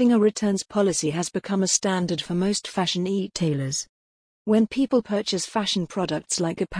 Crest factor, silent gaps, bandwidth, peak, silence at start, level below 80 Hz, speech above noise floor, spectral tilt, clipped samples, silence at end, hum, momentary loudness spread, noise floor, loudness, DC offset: 18 dB; 3.89-4.45 s; 10.5 kHz; -6 dBFS; 0 s; -56 dBFS; over 67 dB; -4.5 dB/octave; under 0.1%; 0 s; none; 6 LU; under -90 dBFS; -24 LUFS; under 0.1%